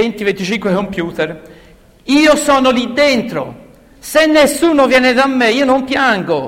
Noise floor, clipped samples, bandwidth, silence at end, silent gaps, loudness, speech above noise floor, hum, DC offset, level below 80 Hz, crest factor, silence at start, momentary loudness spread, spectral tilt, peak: -43 dBFS; under 0.1%; 16.5 kHz; 0 s; none; -12 LUFS; 31 dB; none; under 0.1%; -44 dBFS; 14 dB; 0 s; 12 LU; -4 dB/octave; 0 dBFS